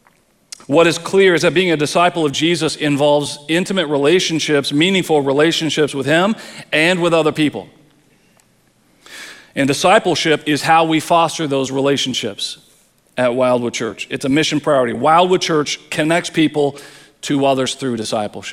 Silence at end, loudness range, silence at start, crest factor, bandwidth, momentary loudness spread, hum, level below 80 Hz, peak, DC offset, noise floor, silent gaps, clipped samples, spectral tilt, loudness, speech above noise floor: 0 s; 4 LU; 0.7 s; 16 dB; 15.5 kHz; 9 LU; none; -58 dBFS; 0 dBFS; under 0.1%; -56 dBFS; none; under 0.1%; -4 dB/octave; -15 LUFS; 40 dB